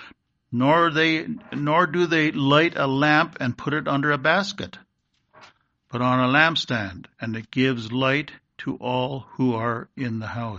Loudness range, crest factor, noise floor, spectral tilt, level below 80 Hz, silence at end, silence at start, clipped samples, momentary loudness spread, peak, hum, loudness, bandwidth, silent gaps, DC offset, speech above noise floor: 5 LU; 22 dB; -71 dBFS; -6 dB/octave; -60 dBFS; 0 s; 0 s; under 0.1%; 13 LU; -2 dBFS; none; -22 LUFS; 7.8 kHz; none; under 0.1%; 48 dB